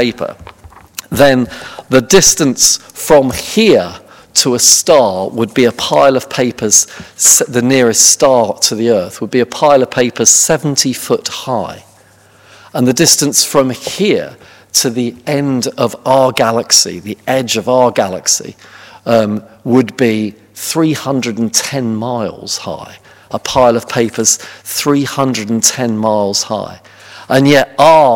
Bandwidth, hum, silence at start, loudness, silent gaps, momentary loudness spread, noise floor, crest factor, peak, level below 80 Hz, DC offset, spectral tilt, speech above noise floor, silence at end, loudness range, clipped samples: over 20 kHz; none; 0 s; -11 LUFS; none; 13 LU; -45 dBFS; 12 dB; 0 dBFS; -46 dBFS; under 0.1%; -3 dB/octave; 33 dB; 0 s; 5 LU; 0.8%